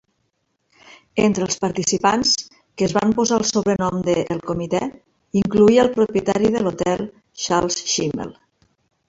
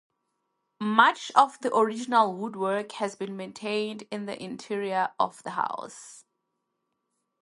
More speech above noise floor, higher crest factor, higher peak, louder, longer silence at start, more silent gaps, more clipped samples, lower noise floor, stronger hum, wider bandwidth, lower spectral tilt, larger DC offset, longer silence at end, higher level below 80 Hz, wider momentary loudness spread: about the same, 51 dB vs 53 dB; second, 18 dB vs 24 dB; about the same, -2 dBFS vs -4 dBFS; first, -19 LUFS vs -27 LUFS; first, 1.15 s vs 0.8 s; neither; neither; second, -70 dBFS vs -80 dBFS; neither; second, 8 kHz vs 11.5 kHz; about the same, -4 dB/octave vs -4 dB/octave; neither; second, 0.75 s vs 1.25 s; first, -52 dBFS vs -80 dBFS; second, 10 LU vs 15 LU